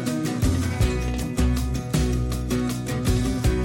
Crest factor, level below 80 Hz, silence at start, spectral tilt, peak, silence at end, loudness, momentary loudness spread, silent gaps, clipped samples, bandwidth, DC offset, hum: 12 dB; -28 dBFS; 0 s; -6 dB/octave; -10 dBFS; 0 s; -24 LUFS; 3 LU; none; under 0.1%; 17 kHz; under 0.1%; none